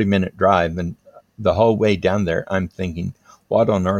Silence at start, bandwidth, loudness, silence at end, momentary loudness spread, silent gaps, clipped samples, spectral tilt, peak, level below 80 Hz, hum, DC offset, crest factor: 0 s; 9 kHz; -19 LUFS; 0 s; 11 LU; none; under 0.1%; -7.5 dB/octave; -2 dBFS; -48 dBFS; none; under 0.1%; 18 dB